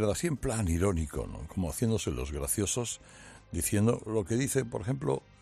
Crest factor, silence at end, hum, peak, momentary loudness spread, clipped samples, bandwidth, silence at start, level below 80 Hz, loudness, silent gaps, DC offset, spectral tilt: 18 dB; 0.25 s; none; -14 dBFS; 10 LU; under 0.1%; 14 kHz; 0 s; -46 dBFS; -31 LUFS; none; under 0.1%; -5 dB/octave